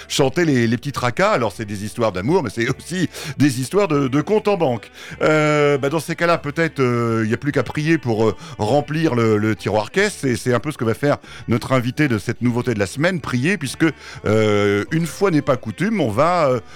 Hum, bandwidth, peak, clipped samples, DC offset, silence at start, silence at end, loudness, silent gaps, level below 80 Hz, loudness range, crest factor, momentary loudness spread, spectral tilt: none; 17 kHz; -6 dBFS; under 0.1%; under 0.1%; 0 s; 0 s; -19 LUFS; none; -50 dBFS; 2 LU; 14 dB; 6 LU; -6 dB/octave